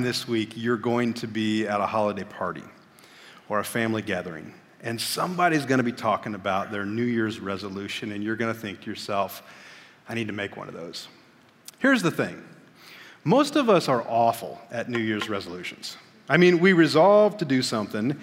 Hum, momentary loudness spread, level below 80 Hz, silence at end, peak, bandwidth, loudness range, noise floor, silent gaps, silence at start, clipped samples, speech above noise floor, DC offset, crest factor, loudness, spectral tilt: none; 18 LU; -70 dBFS; 0 s; -4 dBFS; 16 kHz; 9 LU; -55 dBFS; none; 0 s; under 0.1%; 31 dB; under 0.1%; 22 dB; -25 LUFS; -5.5 dB/octave